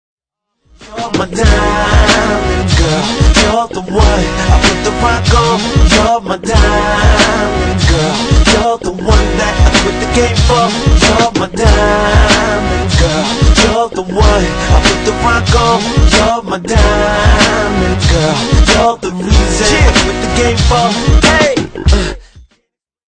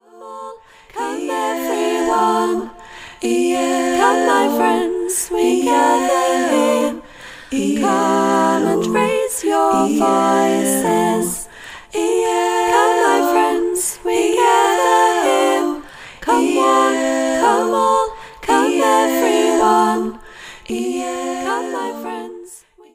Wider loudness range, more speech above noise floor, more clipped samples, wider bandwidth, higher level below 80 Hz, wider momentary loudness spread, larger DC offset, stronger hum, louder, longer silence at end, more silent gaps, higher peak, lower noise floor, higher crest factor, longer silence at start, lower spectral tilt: about the same, 1 LU vs 3 LU; first, 57 dB vs 27 dB; first, 0.3% vs under 0.1%; second, 10 kHz vs 16 kHz; first, -14 dBFS vs -52 dBFS; second, 5 LU vs 14 LU; neither; neither; first, -10 LUFS vs -16 LUFS; first, 0.75 s vs 0.35 s; neither; about the same, 0 dBFS vs -2 dBFS; first, -66 dBFS vs -42 dBFS; about the same, 10 dB vs 14 dB; first, 0.8 s vs 0.15 s; about the same, -4.5 dB/octave vs -3.5 dB/octave